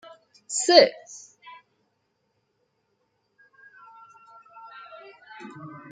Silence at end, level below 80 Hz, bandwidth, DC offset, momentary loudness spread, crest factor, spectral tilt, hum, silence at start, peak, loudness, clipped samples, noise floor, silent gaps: 0.25 s; -80 dBFS; 9.6 kHz; under 0.1%; 29 LU; 28 dB; -1.5 dB/octave; none; 0.5 s; -2 dBFS; -19 LUFS; under 0.1%; -74 dBFS; none